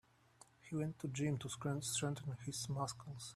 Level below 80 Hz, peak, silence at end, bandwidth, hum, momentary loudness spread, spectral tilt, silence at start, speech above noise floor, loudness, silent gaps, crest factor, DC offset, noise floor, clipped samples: -72 dBFS; -26 dBFS; 0 s; 14 kHz; none; 7 LU; -4.5 dB/octave; 0.65 s; 25 dB; -42 LUFS; none; 16 dB; under 0.1%; -68 dBFS; under 0.1%